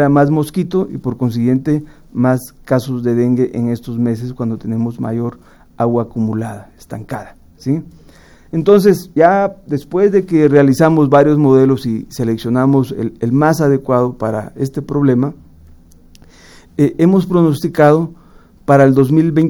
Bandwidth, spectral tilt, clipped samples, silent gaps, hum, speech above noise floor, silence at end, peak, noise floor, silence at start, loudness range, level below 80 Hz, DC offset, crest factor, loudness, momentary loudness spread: 18 kHz; -8 dB/octave; under 0.1%; none; none; 29 dB; 0 s; 0 dBFS; -43 dBFS; 0 s; 8 LU; -44 dBFS; under 0.1%; 14 dB; -14 LUFS; 12 LU